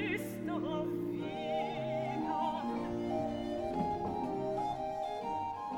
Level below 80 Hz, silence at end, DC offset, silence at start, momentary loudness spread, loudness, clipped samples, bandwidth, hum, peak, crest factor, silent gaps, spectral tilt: -60 dBFS; 0 s; under 0.1%; 0 s; 3 LU; -37 LUFS; under 0.1%; 19 kHz; none; -24 dBFS; 14 dB; none; -6.5 dB/octave